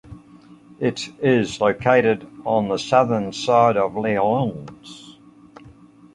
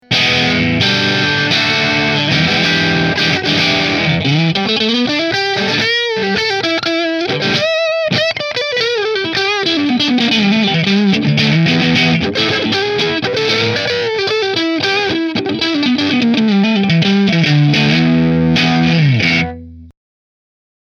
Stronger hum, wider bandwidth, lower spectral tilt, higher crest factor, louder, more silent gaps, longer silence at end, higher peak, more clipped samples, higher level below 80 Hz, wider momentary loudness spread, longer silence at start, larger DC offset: neither; first, 11 kHz vs 9.6 kHz; about the same, -6 dB/octave vs -5 dB/octave; first, 20 dB vs 14 dB; second, -20 LUFS vs -13 LUFS; neither; second, 0.45 s vs 0.95 s; about the same, -2 dBFS vs 0 dBFS; neither; second, -56 dBFS vs -44 dBFS; first, 16 LU vs 4 LU; about the same, 0.1 s vs 0.1 s; neither